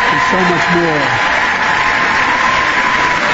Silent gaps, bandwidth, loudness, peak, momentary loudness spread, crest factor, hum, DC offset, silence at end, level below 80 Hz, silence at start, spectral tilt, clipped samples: none; 8 kHz; -11 LUFS; -2 dBFS; 1 LU; 12 dB; none; under 0.1%; 0 s; -38 dBFS; 0 s; -3.5 dB/octave; under 0.1%